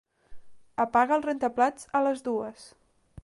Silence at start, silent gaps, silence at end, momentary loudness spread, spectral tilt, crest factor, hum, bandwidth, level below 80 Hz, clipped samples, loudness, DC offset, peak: 0.3 s; none; 0.55 s; 9 LU; -5 dB/octave; 18 dB; none; 11.5 kHz; -62 dBFS; under 0.1%; -27 LUFS; under 0.1%; -10 dBFS